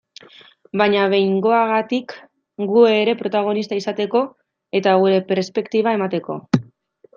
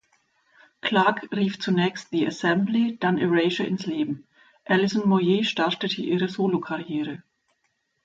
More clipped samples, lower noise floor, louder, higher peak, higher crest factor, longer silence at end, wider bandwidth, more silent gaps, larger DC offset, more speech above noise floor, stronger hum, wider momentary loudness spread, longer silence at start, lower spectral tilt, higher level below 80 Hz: neither; second, -52 dBFS vs -73 dBFS; first, -18 LUFS vs -24 LUFS; first, -2 dBFS vs -8 dBFS; about the same, 18 dB vs 18 dB; second, 0.55 s vs 0.85 s; about the same, 7.2 kHz vs 7.8 kHz; neither; neither; second, 34 dB vs 50 dB; neither; about the same, 10 LU vs 9 LU; about the same, 0.75 s vs 0.85 s; about the same, -6.5 dB/octave vs -6 dB/octave; about the same, -66 dBFS vs -70 dBFS